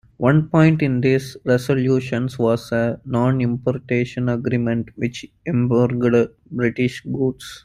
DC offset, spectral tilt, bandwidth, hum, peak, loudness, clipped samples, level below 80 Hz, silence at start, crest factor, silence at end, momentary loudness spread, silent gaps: under 0.1%; -8 dB/octave; 14.5 kHz; none; -2 dBFS; -20 LUFS; under 0.1%; -50 dBFS; 0.2 s; 16 dB; 0.05 s; 8 LU; none